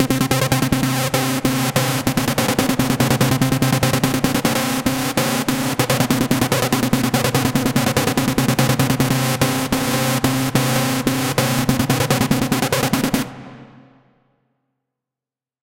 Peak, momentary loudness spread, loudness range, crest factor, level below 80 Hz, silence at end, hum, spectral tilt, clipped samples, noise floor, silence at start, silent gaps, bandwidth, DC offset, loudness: 0 dBFS; 2 LU; 2 LU; 18 dB; -42 dBFS; 1.95 s; none; -4.5 dB/octave; under 0.1%; -90 dBFS; 0 s; none; 17 kHz; 0.3%; -18 LUFS